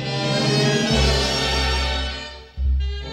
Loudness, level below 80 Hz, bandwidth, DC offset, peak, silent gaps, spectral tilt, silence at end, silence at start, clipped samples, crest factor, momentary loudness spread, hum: -20 LUFS; -26 dBFS; 13.5 kHz; under 0.1%; -6 dBFS; none; -4.5 dB/octave; 0 s; 0 s; under 0.1%; 14 dB; 10 LU; none